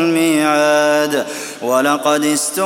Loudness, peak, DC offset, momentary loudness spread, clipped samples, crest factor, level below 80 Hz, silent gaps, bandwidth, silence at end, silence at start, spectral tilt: -15 LUFS; 0 dBFS; under 0.1%; 7 LU; under 0.1%; 14 dB; -64 dBFS; none; 17 kHz; 0 s; 0 s; -3 dB/octave